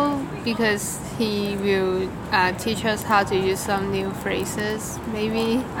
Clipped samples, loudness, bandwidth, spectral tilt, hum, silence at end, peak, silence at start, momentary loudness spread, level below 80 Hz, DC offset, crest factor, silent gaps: under 0.1%; -23 LUFS; 17.5 kHz; -4.5 dB/octave; none; 0 s; -4 dBFS; 0 s; 6 LU; -46 dBFS; under 0.1%; 18 dB; none